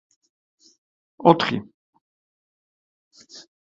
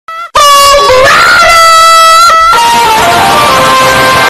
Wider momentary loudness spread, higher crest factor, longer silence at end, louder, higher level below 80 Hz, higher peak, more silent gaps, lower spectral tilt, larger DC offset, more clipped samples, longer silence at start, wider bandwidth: first, 27 LU vs 4 LU; first, 26 dB vs 4 dB; first, 0.25 s vs 0 s; second, -20 LUFS vs -2 LUFS; second, -64 dBFS vs -30 dBFS; about the same, 0 dBFS vs 0 dBFS; first, 1.74-1.93 s, 2.01-3.11 s vs none; first, -6.5 dB/octave vs -1.5 dB/octave; neither; second, under 0.1% vs 2%; first, 1.2 s vs 0.1 s; second, 7.8 kHz vs 16.5 kHz